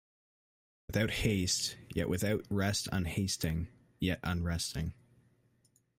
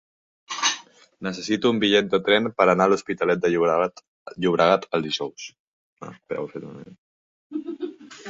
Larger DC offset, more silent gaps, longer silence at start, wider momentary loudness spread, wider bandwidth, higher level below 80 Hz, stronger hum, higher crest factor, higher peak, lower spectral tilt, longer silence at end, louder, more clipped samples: neither; second, none vs 4.08-4.26 s, 5.59-5.97 s, 6.98-7.50 s; first, 0.9 s vs 0.5 s; second, 7 LU vs 20 LU; first, 16 kHz vs 7.8 kHz; first, -52 dBFS vs -62 dBFS; neither; about the same, 18 dB vs 22 dB; second, -18 dBFS vs -2 dBFS; about the same, -4.5 dB/octave vs -4 dB/octave; first, 1.05 s vs 0 s; second, -34 LUFS vs -22 LUFS; neither